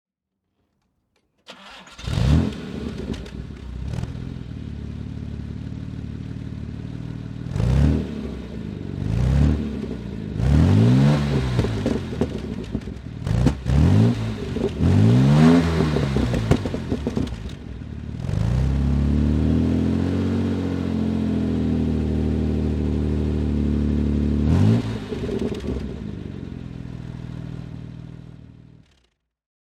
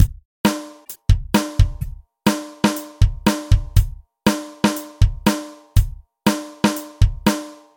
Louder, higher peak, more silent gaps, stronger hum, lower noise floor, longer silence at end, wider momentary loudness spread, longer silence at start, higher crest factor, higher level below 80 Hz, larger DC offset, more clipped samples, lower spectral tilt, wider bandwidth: about the same, -22 LUFS vs -21 LUFS; about the same, -2 dBFS vs 0 dBFS; second, none vs 0.25-0.44 s; neither; first, -79 dBFS vs -38 dBFS; first, 1.2 s vs 0.2 s; first, 17 LU vs 10 LU; first, 1.5 s vs 0 s; about the same, 20 dB vs 18 dB; second, -30 dBFS vs -24 dBFS; neither; neither; first, -8 dB/octave vs -5.5 dB/octave; second, 10.5 kHz vs 17 kHz